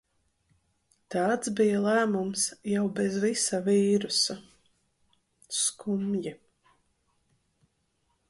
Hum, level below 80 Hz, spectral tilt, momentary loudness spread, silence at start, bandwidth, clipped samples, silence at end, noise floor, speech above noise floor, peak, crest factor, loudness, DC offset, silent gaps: none; -70 dBFS; -3.5 dB/octave; 8 LU; 1.1 s; 11.5 kHz; under 0.1%; 1.95 s; -74 dBFS; 47 dB; -14 dBFS; 16 dB; -27 LUFS; under 0.1%; none